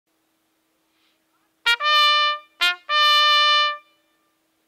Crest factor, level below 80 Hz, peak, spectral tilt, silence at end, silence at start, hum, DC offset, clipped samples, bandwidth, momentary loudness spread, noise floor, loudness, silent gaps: 16 dB; -72 dBFS; -4 dBFS; 4 dB/octave; 0.9 s; 1.65 s; none; under 0.1%; under 0.1%; 16 kHz; 9 LU; -69 dBFS; -17 LUFS; none